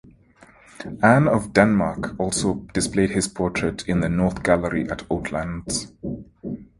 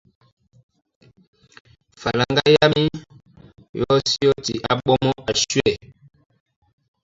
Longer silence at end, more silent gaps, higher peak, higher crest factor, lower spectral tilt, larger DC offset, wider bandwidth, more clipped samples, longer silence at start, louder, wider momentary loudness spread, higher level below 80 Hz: second, 0.15 s vs 1.25 s; second, none vs 3.69-3.74 s; about the same, 0 dBFS vs -2 dBFS; about the same, 22 dB vs 20 dB; about the same, -5.5 dB/octave vs -4.5 dB/octave; neither; first, 11.5 kHz vs 7.8 kHz; neither; second, 0.8 s vs 2 s; second, -22 LUFS vs -19 LUFS; first, 16 LU vs 13 LU; first, -42 dBFS vs -48 dBFS